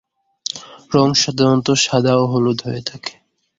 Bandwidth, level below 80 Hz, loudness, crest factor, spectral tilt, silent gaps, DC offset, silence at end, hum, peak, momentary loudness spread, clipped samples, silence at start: 8 kHz; -54 dBFS; -17 LUFS; 16 dB; -4.5 dB/octave; none; under 0.1%; 0.5 s; none; -2 dBFS; 15 LU; under 0.1%; 0.55 s